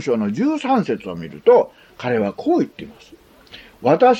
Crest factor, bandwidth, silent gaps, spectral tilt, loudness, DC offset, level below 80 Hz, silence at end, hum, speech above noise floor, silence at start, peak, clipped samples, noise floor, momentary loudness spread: 16 dB; 8.2 kHz; none; -7 dB/octave; -19 LUFS; under 0.1%; -58 dBFS; 0 s; none; 26 dB; 0 s; -2 dBFS; under 0.1%; -44 dBFS; 14 LU